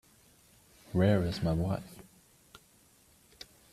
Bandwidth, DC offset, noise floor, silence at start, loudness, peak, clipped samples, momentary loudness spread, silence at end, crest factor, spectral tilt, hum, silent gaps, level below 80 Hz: 14 kHz; under 0.1%; -64 dBFS; 0.9 s; -31 LUFS; -14 dBFS; under 0.1%; 24 LU; 1.7 s; 20 dB; -7.5 dB/octave; none; none; -54 dBFS